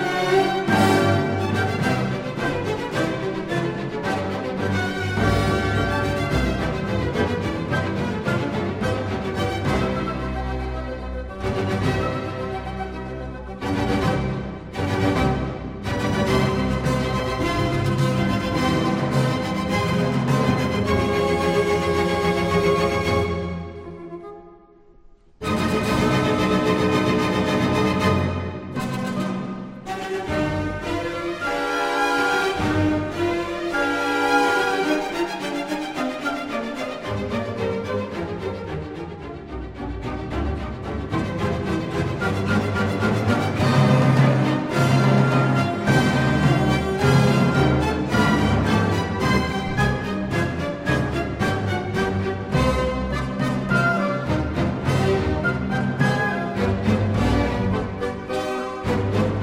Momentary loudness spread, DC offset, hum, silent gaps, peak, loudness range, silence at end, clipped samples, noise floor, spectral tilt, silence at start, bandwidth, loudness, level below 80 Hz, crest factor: 10 LU; under 0.1%; none; none; -4 dBFS; 8 LU; 0 s; under 0.1%; -50 dBFS; -6.5 dB/octave; 0 s; 15.5 kHz; -22 LUFS; -36 dBFS; 18 dB